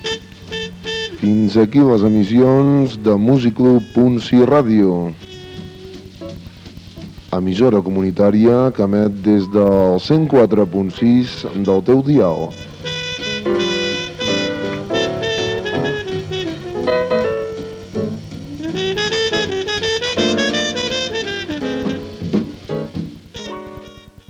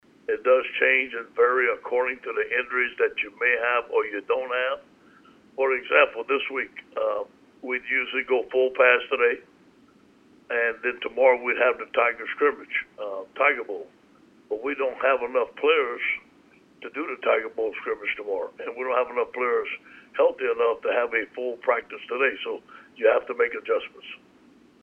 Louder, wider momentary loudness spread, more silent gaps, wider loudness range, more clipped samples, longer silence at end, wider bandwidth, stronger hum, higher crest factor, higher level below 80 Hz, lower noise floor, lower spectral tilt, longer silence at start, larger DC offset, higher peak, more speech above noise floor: first, -16 LUFS vs -24 LUFS; first, 18 LU vs 13 LU; neither; first, 8 LU vs 3 LU; neither; second, 0.35 s vs 0.65 s; first, 15.5 kHz vs 4.6 kHz; neither; second, 14 dB vs 22 dB; first, -46 dBFS vs -68 dBFS; second, -39 dBFS vs -56 dBFS; first, -6 dB/octave vs -4.5 dB/octave; second, 0 s vs 0.3 s; neither; about the same, -4 dBFS vs -4 dBFS; second, 26 dB vs 32 dB